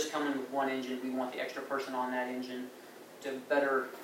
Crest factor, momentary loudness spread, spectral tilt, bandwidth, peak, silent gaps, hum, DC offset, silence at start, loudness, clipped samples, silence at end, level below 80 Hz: 18 dB; 13 LU; -3 dB/octave; 16 kHz; -16 dBFS; none; none; under 0.1%; 0 s; -35 LUFS; under 0.1%; 0 s; under -90 dBFS